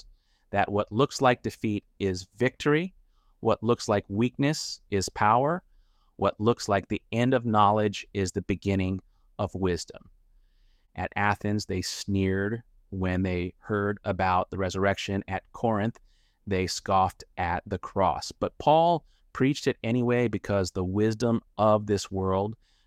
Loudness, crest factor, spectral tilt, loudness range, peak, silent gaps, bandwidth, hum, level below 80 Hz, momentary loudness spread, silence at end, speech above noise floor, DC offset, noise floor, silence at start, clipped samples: -27 LUFS; 20 dB; -5.5 dB/octave; 4 LU; -8 dBFS; none; 15 kHz; none; -54 dBFS; 9 LU; 0.3 s; 36 dB; under 0.1%; -62 dBFS; 0.5 s; under 0.1%